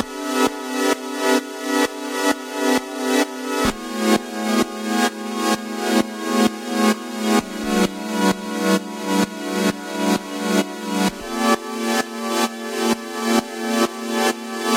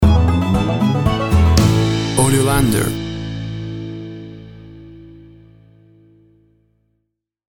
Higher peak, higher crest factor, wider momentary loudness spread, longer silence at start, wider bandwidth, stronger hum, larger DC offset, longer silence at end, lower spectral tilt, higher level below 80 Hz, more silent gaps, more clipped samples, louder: second, -4 dBFS vs 0 dBFS; about the same, 18 dB vs 18 dB; second, 3 LU vs 21 LU; about the same, 0 s vs 0 s; about the same, 16 kHz vs 17 kHz; neither; neither; second, 0 s vs 2.4 s; second, -3.5 dB/octave vs -5.5 dB/octave; second, -52 dBFS vs -26 dBFS; neither; neither; second, -21 LUFS vs -16 LUFS